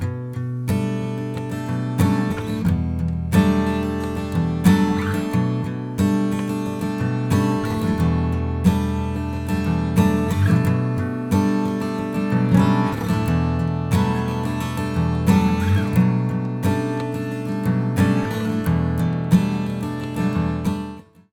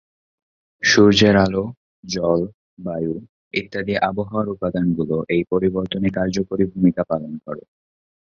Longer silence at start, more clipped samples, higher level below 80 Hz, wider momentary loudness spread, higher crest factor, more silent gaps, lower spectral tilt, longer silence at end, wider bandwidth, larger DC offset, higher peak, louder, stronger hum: second, 0 s vs 0.8 s; neither; first, -36 dBFS vs -46 dBFS; second, 8 LU vs 17 LU; about the same, 18 dB vs 20 dB; second, none vs 1.77-2.03 s, 2.54-2.77 s, 3.29-3.51 s; first, -7.5 dB/octave vs -5.5 dB/octave; second, 0.3 s vs 0.7 s; first, 18 kHz vs 7.4 kHz; neither; about the same, -2 dBFS vs -2 dBFS; about the same, -21 LUFS vs -20 LUFS; neither